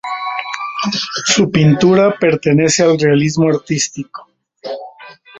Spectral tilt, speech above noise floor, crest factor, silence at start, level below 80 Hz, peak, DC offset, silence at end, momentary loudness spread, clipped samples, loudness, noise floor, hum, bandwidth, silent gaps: -4.5 dB/octave; 26 dB; 14 dB; 0.05 s; -50 dBFS; 0 dBFS; under 0.1%; 0 s; 17 LU; under 0.1%; -14 LUFS; -39 dBFS; none; 8.2 kHz; none